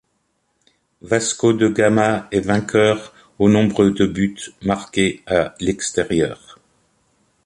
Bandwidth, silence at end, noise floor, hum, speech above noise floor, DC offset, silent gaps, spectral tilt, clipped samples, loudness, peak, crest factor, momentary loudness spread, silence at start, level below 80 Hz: 11.5 kHz; 1.1 s; -68 dBFS; none; 51 dB; under 0.1%; none; -5 dB/octave; under 0.1%; -18 LUFS; -2 dBFS; 18 dB; 8 LU; 1.05 s; -46 dBFS